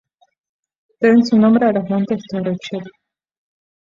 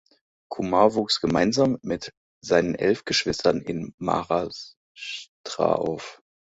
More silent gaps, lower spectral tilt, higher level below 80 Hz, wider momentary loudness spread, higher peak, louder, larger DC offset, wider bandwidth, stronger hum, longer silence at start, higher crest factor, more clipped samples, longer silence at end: second, none vs 2.17-2.41 s, 3.94-3.98 s, 4.77-4.95 s, 5.28-5.44 s; first, -7.5 dB/octave vs -4.5 dB/octave; second, -60 dBFS vs -54 dBFS; second, 13 LU vs 18 LU; about the same, -2 dBFS vs -2 dBFS; first, -16 LUFS vs -24 LUFS; neither; about the same, 7.4 kHz vs 8 kHz; neither; first, 1 s vs 0.5 s; second, 16 dB vs 22 dB; neither; first, 0.95 s vs 0.35 s